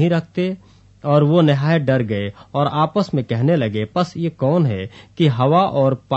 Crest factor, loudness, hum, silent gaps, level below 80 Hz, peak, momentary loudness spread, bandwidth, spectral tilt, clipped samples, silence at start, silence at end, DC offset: 16 dB; -18 LUFS; none; none; -56 dBFS; -2 dBFS; 10 LU; 8 kHz; -8.5 dB/octave; under 0.1%; 0 s; 0 s; under 0.1%